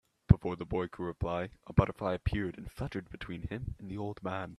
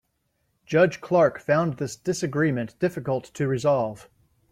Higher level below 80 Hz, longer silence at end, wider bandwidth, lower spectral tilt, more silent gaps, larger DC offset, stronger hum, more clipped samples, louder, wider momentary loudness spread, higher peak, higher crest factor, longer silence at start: first, -44 dBFS vs -62 dBFS; second, 0.05 s vs 0.55 s; second, 12 kHz vs 15 kHz; first, -9 dB/octave vs -6.5 dB/octave; neither; neither; neither; neither; second, -34 LUFS vs -24 LUFS; first, 14 LU vs 8 LU; about the same, -4 dBFS vs -6 dBFS; first, 28 dB vs 18 dB; second, 0.3 s vs 0.7 s